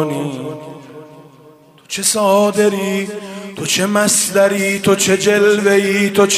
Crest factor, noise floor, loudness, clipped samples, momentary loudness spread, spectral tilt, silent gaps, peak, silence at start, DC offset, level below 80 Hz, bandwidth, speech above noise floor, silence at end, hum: 14 dB; -44 dBFS; -14 LUFS; under 0.1%; 16 LU; -3.5 dB/octave; none; 0 dBFS; 0 s; under 0.1%; -60 dBFS; 16 kHz; 30 dB; 0 s; none